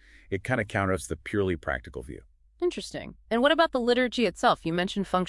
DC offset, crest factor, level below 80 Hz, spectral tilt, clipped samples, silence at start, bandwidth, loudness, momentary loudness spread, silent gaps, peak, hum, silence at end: under 0.1%; 20 dB; -50 dBFS; -5 dB/octave; under 0.1%; 0.3 s; 12 kHz; -27 LUFS; 15 LU; none; -8 dBFS; none; 0 s